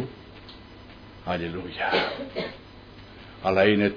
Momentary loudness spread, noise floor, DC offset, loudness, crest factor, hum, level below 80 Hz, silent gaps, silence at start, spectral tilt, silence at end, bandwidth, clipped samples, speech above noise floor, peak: 25 LU; -46 dBFS; under 0.1%; -26 LUFS; 22 dB; none; -52 dBFS; none; 0 s; -7 dB/octave; 0 s; 5.2 kHz; under 0.1%; 21 dB; -6 dBFS